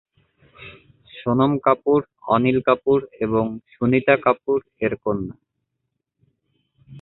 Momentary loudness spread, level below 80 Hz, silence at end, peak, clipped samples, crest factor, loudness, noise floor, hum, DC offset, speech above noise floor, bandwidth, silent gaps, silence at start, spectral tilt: 11 LU; -54 dBFS; 0 s; -2 dBFS; under 0.1%; 20 dB; -20 LUFS; -78 dBFS; none; under 0.1%; 58 dB; 4.1 kHz; none; 0.6 s; -11 dB/octave